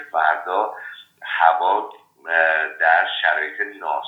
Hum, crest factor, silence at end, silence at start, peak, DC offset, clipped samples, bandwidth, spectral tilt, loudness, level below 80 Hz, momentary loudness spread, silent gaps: none; 20 dB; 0 s; 0 s; 0 dBFS; under 0.1%; under 0.1%; 5.2 kHz; -2 dB/octave; -19 LUFS; -90 dBFS; 19 LU; none